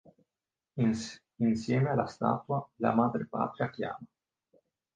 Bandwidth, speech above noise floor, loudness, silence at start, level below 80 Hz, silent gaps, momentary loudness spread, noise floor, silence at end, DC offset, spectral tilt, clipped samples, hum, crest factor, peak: 9.2 kHz; over 60 dB; -31 LUFS; 0.75 s; -66 dBFS; none; 10 LU; under -90 dBFS; 0.9 s; under 0.1%; -7.5 dB/octave; under 0.1%; none; 20 dB; -12 dBFS